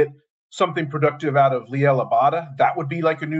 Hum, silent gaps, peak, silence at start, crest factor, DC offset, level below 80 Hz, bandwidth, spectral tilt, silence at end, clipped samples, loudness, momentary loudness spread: none; 0.30-0.50 s; -4 dBFS; 0 s; 16 dB; under 0.1%; -68 dBFS; 8 kHz; -7 dB/octave; 0 s; under 0.1%; -20 LUFS; 5 LU